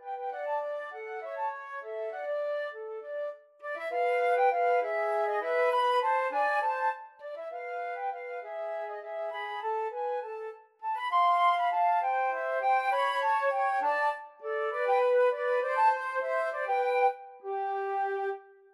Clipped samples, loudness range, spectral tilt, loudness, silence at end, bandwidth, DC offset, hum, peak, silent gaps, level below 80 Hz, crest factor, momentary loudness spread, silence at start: under 0.1%; 8 LU; 0 dB/octave; -30 LUFS; 0.3 s; 12 kHz; under 0.1%; none; -16 dBFS; none; under -90 dBFS; 14 dB; 13 LU; 0 s